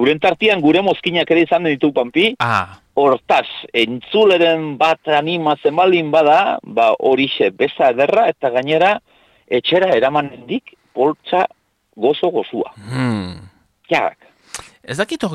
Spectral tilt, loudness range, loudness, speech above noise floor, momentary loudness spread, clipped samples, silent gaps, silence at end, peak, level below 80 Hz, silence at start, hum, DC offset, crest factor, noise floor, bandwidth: -5.5 dB/octave; 6 LU; -16 LUFS; 20 dB; 11 LU; under 0.1%; none; 0 s; -4 dBFS; -58 dBFS; 0 s; none; under 0.1%; 12 dB; -36 dBFS; 12.5 kHz